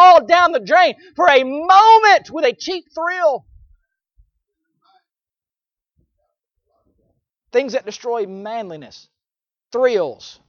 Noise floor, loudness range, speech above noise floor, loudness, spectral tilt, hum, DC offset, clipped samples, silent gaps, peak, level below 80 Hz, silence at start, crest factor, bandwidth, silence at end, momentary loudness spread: under -90 dBFS; 14 LU; over 74 dB; -15 LUFS; -3 dB/octave; none; under 0.1%; under 0.1%; none; 0 dBFS; -60 dBFS; 0 s; 16 dB; 7 kHz; 0.2 s; 18 LU